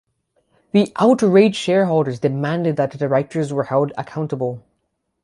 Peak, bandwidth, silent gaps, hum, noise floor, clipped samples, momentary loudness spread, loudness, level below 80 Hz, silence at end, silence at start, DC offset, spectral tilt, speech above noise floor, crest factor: -2 dBFS; 11.5 kHz; none; none; -72 dBFS; under 0.1%; 11 LU; -18 LUFS; -62 dBFS; 0.65 s; 0.75 s; under 0.1%; -7 dB/octave; 54 dB; 16 dB